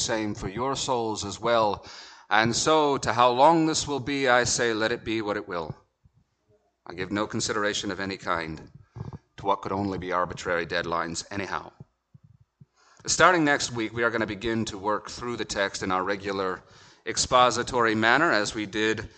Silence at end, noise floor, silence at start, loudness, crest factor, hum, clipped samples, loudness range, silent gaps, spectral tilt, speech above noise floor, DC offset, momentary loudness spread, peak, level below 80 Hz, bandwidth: 0.1 s; -67 dBFS; 0 s; -25 LUFS; 24 dB; none; under 0.1%; 8 LU; none; -3.5 dB/octave; 42 dB; under 0.1%; 14 LU; -2 dBFS; -54 dBFS; 9.2 kHz